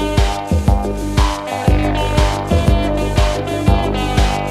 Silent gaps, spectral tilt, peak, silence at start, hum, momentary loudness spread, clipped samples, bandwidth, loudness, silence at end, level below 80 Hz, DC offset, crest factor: none; -6 dB/octave; 0 dBFS; 0 s; none; 2 LU; under 0.1%; 14 kHz; -17 LUFS; 0 s; -18 dBFS; under 0.1%; 14 dB